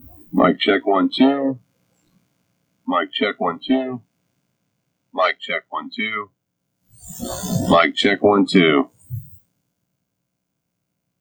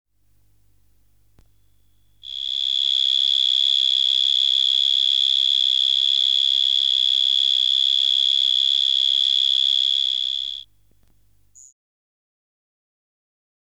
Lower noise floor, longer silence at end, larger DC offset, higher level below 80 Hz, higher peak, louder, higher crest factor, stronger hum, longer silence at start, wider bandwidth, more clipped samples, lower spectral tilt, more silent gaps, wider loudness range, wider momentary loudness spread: first, -76 dBFS vs -62 dBFS; second, 1.95 s vs 3.1 s; second, under 0.1% vs 0.1%; first, -54 dBFS vs -64 dBFS; first, 0 dBFS vs -10 dBFS; second, -19 LUFS vs -16 LUFS; first, 20 dB vs 12 dB; second, none vs 50 Hz at -65 dBFS; second, 0.35 s vs 2.25 s; first, over 20 kHz vs 11.5 kHz; neither; first, -5 dB/octave vs 4 dB/octave; neither; about the same, 7 LU vs 7 LU; first, 19 LU vs 5 LU